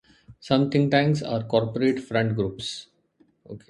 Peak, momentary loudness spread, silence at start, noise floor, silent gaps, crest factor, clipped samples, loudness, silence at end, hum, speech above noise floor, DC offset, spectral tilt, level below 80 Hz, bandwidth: -6 dBFS; 12 LU; 0.3 s; -63 dBFS; none; 20 dB; under 0.1%; -24 LUFS; 0.1 s; none; 40 dB; under 0.1%; -6.5 dB/octave; -56 dBFS; 11 kHz